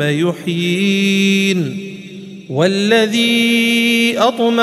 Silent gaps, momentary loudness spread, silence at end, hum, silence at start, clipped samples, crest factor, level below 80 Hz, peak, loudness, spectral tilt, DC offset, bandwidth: none; 15 LU; 0 s; none; 0 s; under 0.1%; 14 dB; -64 dBFS; 0 dBFS; -14 LUFS; -4.5 dB/octave; under 0.1%; 15 kHz